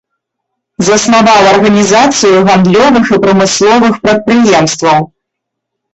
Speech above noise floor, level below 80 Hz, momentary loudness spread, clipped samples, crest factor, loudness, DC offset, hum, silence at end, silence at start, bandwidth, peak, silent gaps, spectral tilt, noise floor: 68 dB; -42 dBFS; 5 LU; under 0.1%; 8 dB; -7 LUFS; under 0.1%; none; 0.85 s; 0.8 s; 8.4 kHz; 0 dBFS; none; -4.5 dB/octave; -74 dBFS